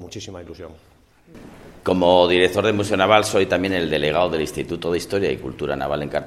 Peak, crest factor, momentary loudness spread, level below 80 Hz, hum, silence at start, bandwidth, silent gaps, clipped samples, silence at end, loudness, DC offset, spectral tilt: 0 dBFS; 20 dB; 19 LU; -48 dBFS; none; 0 s; 14.5 kHz; none; under 0.1%; 0 s; -19 LUFS; under 0.1%; -4.5 dB/octave